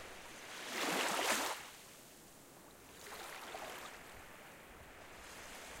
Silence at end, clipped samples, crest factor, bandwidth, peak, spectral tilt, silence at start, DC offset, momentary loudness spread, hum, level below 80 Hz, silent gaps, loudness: 0 s; under 0.1%; 24 dB; 16.5 kHz; -20 dBFS; -1 dB/octave; 0 s; under 0.1%; 21 LU; none; -70 dBFS; none; -41 LUFS